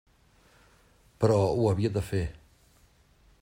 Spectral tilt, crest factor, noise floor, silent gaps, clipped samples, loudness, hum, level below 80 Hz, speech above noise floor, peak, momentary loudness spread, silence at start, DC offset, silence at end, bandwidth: -7.5 dB/octave; 20 dB; -62 dBFS; none; under 0.1%; -27 LUFS; none; -52 dBFS; 36 dB; -10 dBFS; 9 LU; 1.2 s; under 0.1%; 1.1 s; 16 kHz